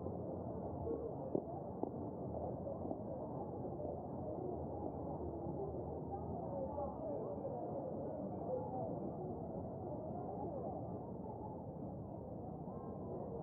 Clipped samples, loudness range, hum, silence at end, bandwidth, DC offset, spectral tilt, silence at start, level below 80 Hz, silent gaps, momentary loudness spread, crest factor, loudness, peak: under 0.1%; 2 LU; none; 0 s; 2.4 kHz; under 0.1%; -10.5 dB/octave; 0 s; -62 dBFS; none; 5 LU; 22 dB; -45 LUFS; -22 dBFS